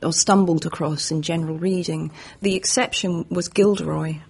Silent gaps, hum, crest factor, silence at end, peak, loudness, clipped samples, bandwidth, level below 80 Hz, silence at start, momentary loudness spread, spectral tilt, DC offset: none; none; 18 dB; 0.05 s; -4 dBFS; -21 LUFS; under 0.1%; 11.5 kHz; -54 dBFS; 0 s; 9 LU; -4 dB/octave; under 0.1%